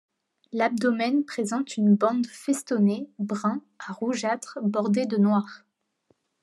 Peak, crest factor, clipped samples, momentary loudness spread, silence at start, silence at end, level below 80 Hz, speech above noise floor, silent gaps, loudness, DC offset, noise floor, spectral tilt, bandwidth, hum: -10 dBFS; 16 dB; under 0.1%; 9 LU; 0.55 s; 0.85 s; -82 dBFS; 44 dB; none; -25 LUFS; under 0.1%; -69 dBFS; -6 dB/octave; 12 kHz; none